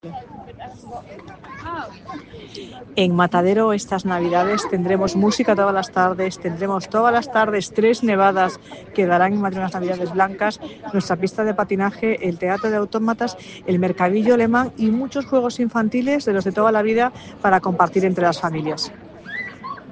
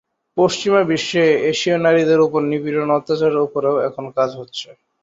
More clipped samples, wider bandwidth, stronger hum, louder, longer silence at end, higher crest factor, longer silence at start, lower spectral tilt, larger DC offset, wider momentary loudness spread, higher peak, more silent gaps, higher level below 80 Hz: neither; first, 9.4 kHz vs 7.8 kHz; neither; about the same, -19 LUFS vs -17 LUFS; second, 0 s vs 0.3 s; about the same, 18 dB vs 16 dB; second, 0.05 s vs 0.35 s; about the same, -6 dB/octave vs -5 dB/octave; neither; first, 19 LU vs 10 LU; about the same, -2 dBFS vs -2 dBFS; neither; first, -54 dBFS vs -62 dBFS